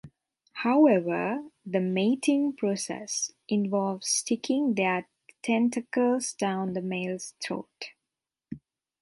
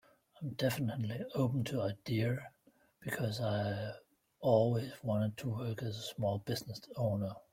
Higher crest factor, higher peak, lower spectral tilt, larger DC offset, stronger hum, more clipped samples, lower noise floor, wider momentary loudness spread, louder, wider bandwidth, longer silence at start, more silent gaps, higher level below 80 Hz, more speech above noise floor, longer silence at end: about the same, 18 dB vs 20 dB; first, -10 dBFS vs -16 dBFS; second, -4.5 dB/octave vs -6.5 dB/octave; neither; neither; neither; first, -88 dBFS vs -67 dBFS; first, 13 LU vs 10 LU; first, -27 LUFS vs -36 LUFS; second, 11.5 kHz vs 16.5 kHz; second, 0.05 s vs 0.4 s; neither; about the same, -72 dBFS vs -68 dBFS; first, 61 dB vs 32 dB; first, 0.45 s vs 0.1 s